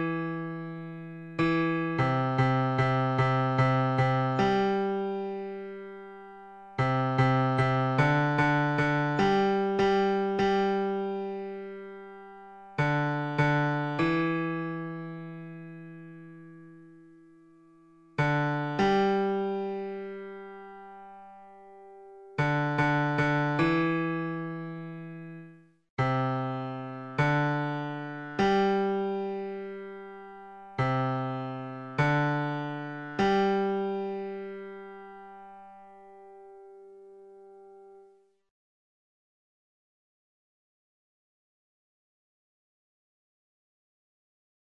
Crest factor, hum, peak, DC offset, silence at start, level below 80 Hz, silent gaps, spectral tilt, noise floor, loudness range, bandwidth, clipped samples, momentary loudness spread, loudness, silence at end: 18 dB; none; -12 dBFS; under 0.1%; 0 s; -60 dBFS; 25.90-25.97 s; -7.5 dB/octave; -61 dBFS; 9 LU; 8.2 kHz; under 0.1%; 20 LU; -28 LUFS; 6.6 s